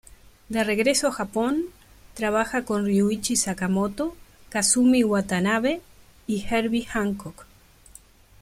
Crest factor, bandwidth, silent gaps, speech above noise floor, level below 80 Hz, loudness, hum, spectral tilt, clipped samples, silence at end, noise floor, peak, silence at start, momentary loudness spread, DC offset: 18 dB; 16 kHz; none; 28 dB; -50 dBFS; -24 LUFS; none; -4 dB/octave; under 0.1%; 1 s; -51 dBFS; -8 dBFS; 0.5 s; 12 LU; under 0.1%